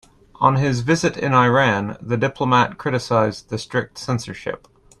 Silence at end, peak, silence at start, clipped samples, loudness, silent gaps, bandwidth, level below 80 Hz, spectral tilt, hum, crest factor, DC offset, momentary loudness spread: 0.45 s; -2 dBFS; 0.4 s; under 0.1%; -19 LUFS; none; 11.5 kHz; -50 dBFS; -6 dB/octave; none; 18 dB; under 0.1%; 12 LU